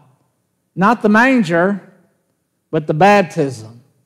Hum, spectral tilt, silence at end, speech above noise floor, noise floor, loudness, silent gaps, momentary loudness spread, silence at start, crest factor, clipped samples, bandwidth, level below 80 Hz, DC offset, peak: none; -6.5 dB/octave; 0.35 s; 54 dB; -67 dBFS; -14 LUFS; none; 14 LU; 0.75 s; 16 dB; under 0.1%; 13 kHz; -58 dBFS; under 0.1%; 0 dBFS